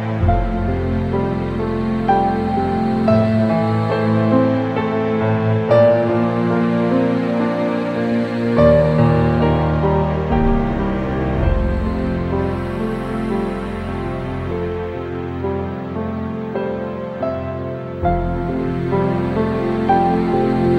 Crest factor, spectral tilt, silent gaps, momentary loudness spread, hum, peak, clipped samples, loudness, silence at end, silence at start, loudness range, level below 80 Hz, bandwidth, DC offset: 16 dB; -9 dB/octave; none; 9 LU; none; -2 dBFS; under 0.1%; -18 LUFS; 0 s; 0 s; 7 LU; -30 dBFS; 8.6 kHz; under 0.1%